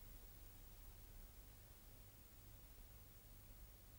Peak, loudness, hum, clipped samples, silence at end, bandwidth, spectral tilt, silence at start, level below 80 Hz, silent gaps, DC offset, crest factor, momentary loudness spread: -48 dBFS; -62 LUFS; none; under 0.1%; 0 s; 19.5 kHz; -4 dB/octave; 0 s; -64 dBFS; none; under 0.1%; 12 dB; 2 LU